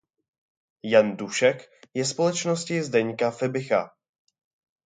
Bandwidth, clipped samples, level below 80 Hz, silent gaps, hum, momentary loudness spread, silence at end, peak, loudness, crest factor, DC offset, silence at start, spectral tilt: 9.6 kHz; under 0.1%; -74 dBFS; none; none; 12 LU; 1 s; -4 dBFS; -24 LUFS; 22 dB; under 0.1%; 0.85 s; -4.5 dB/octave